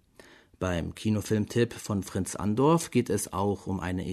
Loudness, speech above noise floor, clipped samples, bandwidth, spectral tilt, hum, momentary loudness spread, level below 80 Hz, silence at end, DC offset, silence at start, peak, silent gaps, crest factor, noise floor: -29 LUFS; 28 dB; under 0.1%; 13.5 kHz; -6 dB/octave; none; 8 LU; -52 dBFS; 0 s; under 0.1%; 0.6 s; -12 dBFS; none; 18 dB; -56 dBFS